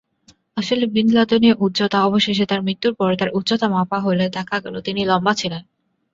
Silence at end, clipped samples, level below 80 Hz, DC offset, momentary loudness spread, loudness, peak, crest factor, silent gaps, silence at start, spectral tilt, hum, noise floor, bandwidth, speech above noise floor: 0.55 s; under 0.1%; -56 dBFS; under 0.1%; 9 LU; -18 LUFS; -2 dBFS; 16 dB; none; 0.55 s; -5.5 dB/octave; none; -56 dBFS; 7.8 kHz; 38 dB